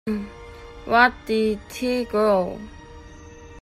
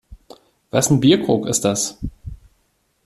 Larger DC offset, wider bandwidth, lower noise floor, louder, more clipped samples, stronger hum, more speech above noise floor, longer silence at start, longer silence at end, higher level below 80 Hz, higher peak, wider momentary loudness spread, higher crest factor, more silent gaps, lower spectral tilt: neither; about the same, 15 kHz vs 15 kHz; second, -43 dBFS vs -65 dBFS; second, -22 LUFS vs -17 LUFS; neither; neither; second, 21 dB vs 48 dB; about the same, 0.05 s vs 0.1 s; second, 0 s vs 0.7 s; about the same, -46 dBFS vs -42 dBFS; about the same, -2 dBFS vs -2 dBFS; first, 22 LU vs 19 LU; about the same, 22 dB vs 18 dB; neither; about the same, -5 dB/octave vs -4.5 dB/octave